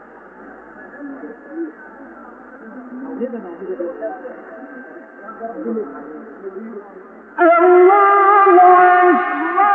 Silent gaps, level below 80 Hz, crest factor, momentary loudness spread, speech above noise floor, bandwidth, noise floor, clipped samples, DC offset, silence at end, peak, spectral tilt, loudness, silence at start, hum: none; -68 dBFS; 16 dB; 25 LU; 20 dB; 3.8 kHz; -39 dBFS; under 0.1%; under 0.1%; 0 s; 0 dBFS; -8.5 dB/octave; -12 LUFS; 0.45 s; none